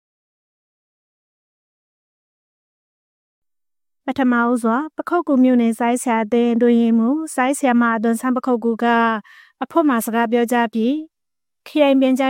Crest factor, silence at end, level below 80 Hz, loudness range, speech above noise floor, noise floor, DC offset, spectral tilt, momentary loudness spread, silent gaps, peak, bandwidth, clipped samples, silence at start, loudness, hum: 16 dB; 0 s; -68 dBFS; 7 LU; over 73 dB; under -90 dBFS; under 0.1%; -5 dB/octave; 7 LU; none; -2 dBFS; 16.5 kHz; under 0.1%; 4.05 s; -18 LUFS; none